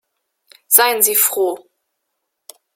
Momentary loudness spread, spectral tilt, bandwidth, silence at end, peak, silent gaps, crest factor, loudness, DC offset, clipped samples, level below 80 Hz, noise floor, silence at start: 11 LU; 0.5 dB/octave; 16.5 kHz; 1.2 s; 0 dBFS; none; 20 dB; -13 LUFS; under 0.1%; under 0.1%; -72 dBFS; -75 dBFS; 0.7 s